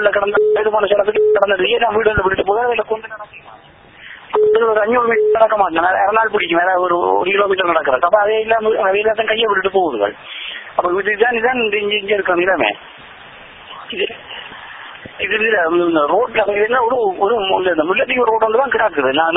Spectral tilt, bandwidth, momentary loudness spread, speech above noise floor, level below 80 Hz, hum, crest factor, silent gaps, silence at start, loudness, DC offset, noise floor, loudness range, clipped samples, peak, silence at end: -8 dB/octave; 3.9 kHz; 13 LU; 27 dB; -46 dBFS; none; 16 dB; none; 0 s; -15 LUFS; under 0.1%; -42 dBFS; 5 LU; under 0.1%; 0 dBFS; 0 s